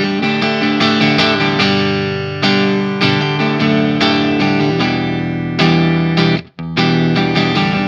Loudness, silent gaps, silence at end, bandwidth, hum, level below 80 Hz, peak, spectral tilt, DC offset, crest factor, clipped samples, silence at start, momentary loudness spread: -14 LUFS; none; 0 s; 7.4 kHz; none; -46 dBFS; 0 dBFS; -6 dB/octave; under 0.1%; 14 dB; under 0.1%; 0 s; 5 LU